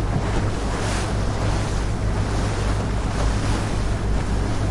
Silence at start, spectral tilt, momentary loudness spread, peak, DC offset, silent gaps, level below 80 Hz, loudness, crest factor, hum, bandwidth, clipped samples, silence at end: 0 s; -5.5 dB/octave; 2 LU; -10 dBFS; under 0.1%; none; -26 dBFS; -24 LUFS; 12 dB; none; 11.5 kHz; under 0.1%; 0 s